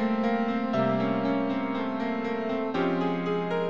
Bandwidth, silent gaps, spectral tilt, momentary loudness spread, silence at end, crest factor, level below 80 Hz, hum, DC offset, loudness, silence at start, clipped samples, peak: 7 kHz; none; -8 dB/octave; 4 LU; 0 s; 14 dB; -68 dBFS; none; 0.5%; -28 LUFS; 0 s; under 0.1%; -14 dBFS